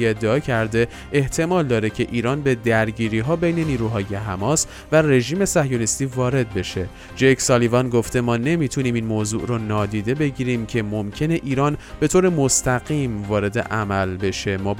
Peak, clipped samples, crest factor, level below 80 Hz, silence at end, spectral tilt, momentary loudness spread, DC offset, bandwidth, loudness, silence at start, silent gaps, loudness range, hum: -2 dBFS; under 0.1%; 18 dB; -42 dBFS; 0 s; -5 dB/octave; 7 LU; under 0.1%; 16.5 kHz; -20 LUFS; 0 s; none; 2 LU; none